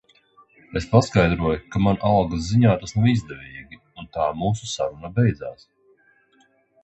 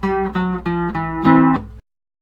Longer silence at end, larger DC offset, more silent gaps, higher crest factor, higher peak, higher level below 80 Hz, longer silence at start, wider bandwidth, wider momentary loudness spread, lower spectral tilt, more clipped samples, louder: first, 1.3 s vs 0.4 s; neither; neither; first, 22 dB vs 16 dB; about the same, -2 dBFS vs -2 dBFS; about the same, -42 dBFS vs -38 dBFS; first, 0.7 s vs 0 s; first, 8.2 kHz vs 5.6 kHz; first, 19 LU vs 9 LU; second, -7 dB/octave vs -9.5 dB/octave; neither; second, -21 LUFS vs -17 LUFS